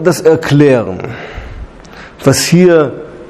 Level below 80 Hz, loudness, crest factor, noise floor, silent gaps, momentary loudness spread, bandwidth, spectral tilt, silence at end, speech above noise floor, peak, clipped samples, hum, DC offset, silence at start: -36 dBFS; -10 LUFS; 12 dB; -33 dBFS; none; 20 LU; 15 kHz; -5.5 dB/octave; 0.05 s; 24 dB; 0 dBFS; 0.5%; none; under 0.1%; 0 s